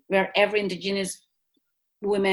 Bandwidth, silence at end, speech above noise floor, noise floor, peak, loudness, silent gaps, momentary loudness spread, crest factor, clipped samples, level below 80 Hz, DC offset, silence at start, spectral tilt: 12.5 kHz; 0 s; 50 dB; -74 dBFS; -6 dBFS; -25 LUFS; none; 12 LU; 20 dB; under 0.1%; -64 dBFS; under 0.1%; 0.1 s; -4 dB/octave